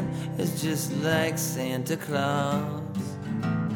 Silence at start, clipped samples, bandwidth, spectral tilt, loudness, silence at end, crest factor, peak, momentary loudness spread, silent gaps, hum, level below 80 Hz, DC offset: 0 s; under 0.1%; 19 kHz; -5 dB/octave; -28 LUFS; 0 s; 18 dB; -10 dBFS; 7 LU; none; none; -60 dBFS; under 0.1%